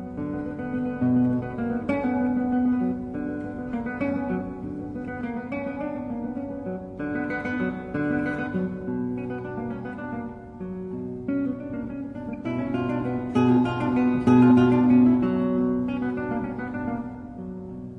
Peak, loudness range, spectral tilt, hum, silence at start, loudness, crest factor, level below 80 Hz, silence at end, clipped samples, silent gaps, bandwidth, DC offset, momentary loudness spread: -8 dBFS; 11 LU; -9 dB/octave; none; 0 s; -26 LUFS; 18 dB; -50 dBFS; 0 s; under 0.1%; none; 5.8 kHz; under 0.1%; 14 LU